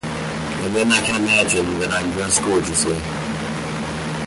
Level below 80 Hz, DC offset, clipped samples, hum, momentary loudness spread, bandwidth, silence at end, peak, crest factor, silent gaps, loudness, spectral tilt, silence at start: -42 dBFS; under 0.1%; under 0.1%; none; 10 LU; 11.5 kHz; 0 s; -4 dBFS; 18 dB; none; -19 LUFS; -3.5 dB/octave; 0.05 s